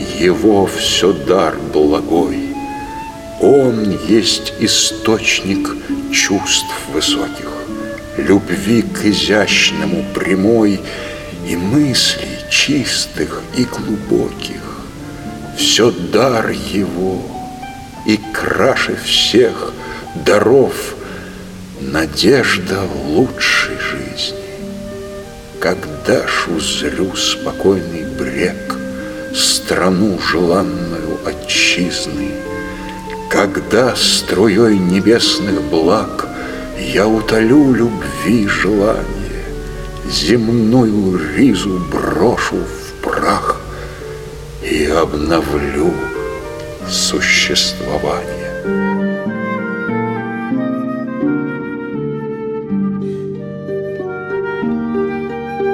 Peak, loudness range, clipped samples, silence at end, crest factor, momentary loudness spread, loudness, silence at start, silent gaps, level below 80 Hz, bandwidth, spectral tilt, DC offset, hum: 0 dBFS; 5 LU; under 0.1%; 0 s; 16 dB; 14 LU; -15 LUFS; 0 s; none; -36 dBFS; 17 kHz; -4 dB/octave; under 0.1%; none